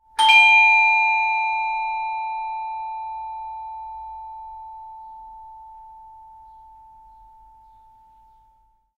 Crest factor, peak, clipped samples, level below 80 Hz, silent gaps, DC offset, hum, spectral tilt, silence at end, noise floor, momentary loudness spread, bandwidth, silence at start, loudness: 20 dB; -2 dBFS; under 0.1%; -60 dBFS; none; under 0.1%; none; 2 dB/octave; 2.75 s; -60 dBFS; 27 LU; 14.5 kHz; 0.2 s; -16 LUFS